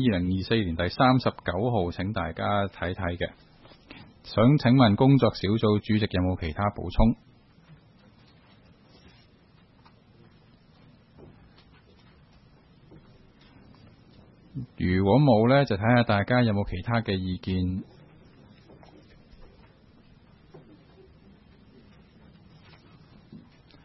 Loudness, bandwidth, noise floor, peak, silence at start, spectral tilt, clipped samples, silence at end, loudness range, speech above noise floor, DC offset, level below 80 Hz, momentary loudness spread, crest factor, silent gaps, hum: -25 LUFS; 6 kHz; -58 dBFS; -8 dBFS; 0 s; -9.5 dB/octave; under 0.1%; 0.5 s; 10 LU; 34 dB; under 0.1%; -44 dBFS; 12 LU; 20 dB; none; none